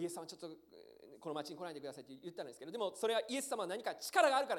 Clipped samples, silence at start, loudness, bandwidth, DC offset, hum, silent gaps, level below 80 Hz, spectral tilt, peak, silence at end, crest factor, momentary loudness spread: under 0.1%; 0 s; -39 LUFS; 18 kHz; under 0.1%; none; none; -86 dBFS; -2.5 dB/octave; -16 dBFS; 0 s; 22 dB; 19 LU